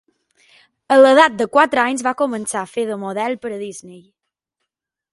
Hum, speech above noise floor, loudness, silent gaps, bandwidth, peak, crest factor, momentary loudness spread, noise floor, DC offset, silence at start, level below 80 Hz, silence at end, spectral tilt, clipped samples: none; 64 dB; -16 LUFS; none; 11.5 kHz; 0 dBFS; 18 dB; 17 LU; -81 dBFS; under 0.1%; 0.9 s; -66 dBFS; 1.15 s; -3.5 dB/octave; under 0.1%